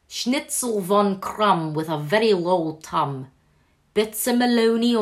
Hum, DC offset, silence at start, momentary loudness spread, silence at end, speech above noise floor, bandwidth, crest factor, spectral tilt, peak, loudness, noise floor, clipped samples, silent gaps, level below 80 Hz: none; under 0.1%; 0.1 s; 7 LU; 0 s; 41 dB; 15.5 kHz; 16 dB; -4.5 dB/octave; -6 dBFS; -22 LUFS; -62 dBFS; under 0.1%; none; -62 dBFS